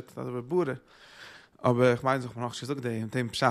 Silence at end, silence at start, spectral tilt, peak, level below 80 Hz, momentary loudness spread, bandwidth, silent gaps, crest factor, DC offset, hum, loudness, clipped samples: 0 s; 0 s; -6 dB/octave; -8 dBFS; -66 dBFS; 23 LU; 14 kHz; none; 20 dB; under 0.1%; none; -29 LUFS; under 0.1%